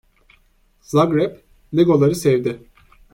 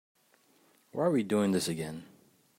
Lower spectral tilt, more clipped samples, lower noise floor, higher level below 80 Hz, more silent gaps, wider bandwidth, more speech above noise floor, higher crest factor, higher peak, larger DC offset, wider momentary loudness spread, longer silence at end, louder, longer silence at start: first, -7 dB/octave vs -5.5 dB/octave; neither; second, -58 dBFS vs -67 dBFS; first, -52 dBFS vs -72 dBFS; neither; about the same, 16.5 kHz vs 16 kHz; first, 41 dB vs 37 dB; about the same, 16 dB vs 18 dB; first, -2 dBFS vs -16 dBFS; neither; second, 10 LU vs 14 LU; about the same, 0.55 s vs 0.55 s; first, -18 LUFS vs -31 LUFS; about the same, 0.9 s vs 0.95 s